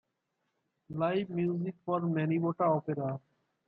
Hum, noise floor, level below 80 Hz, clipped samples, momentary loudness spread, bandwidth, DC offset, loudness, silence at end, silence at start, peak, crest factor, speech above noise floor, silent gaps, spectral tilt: none; -82 dBFS; -74 dBFS; under 0.1%; 8 LU; 4.8 kHz; under 0.1%; -32 LUFS; 0.5 s; 0.9 s; -16 dBFS; 16 dB; 51 dB; none; -11 dB/octave